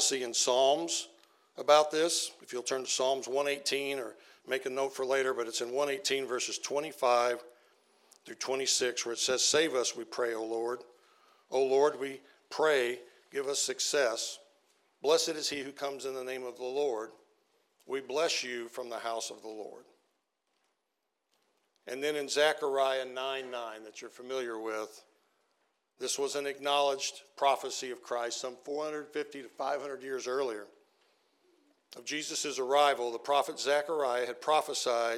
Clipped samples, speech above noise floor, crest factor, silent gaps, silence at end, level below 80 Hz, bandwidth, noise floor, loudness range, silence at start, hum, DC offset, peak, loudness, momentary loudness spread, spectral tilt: under 0.1%; 51 dB; 24 dB; none; 0 s; -90 dBFS; 16 kHz; -83 dBFS; 8 LU; 0 s; none; under 0.1%; -10 dBFS; -32 LUFS; 13 LU; -1 dB/octave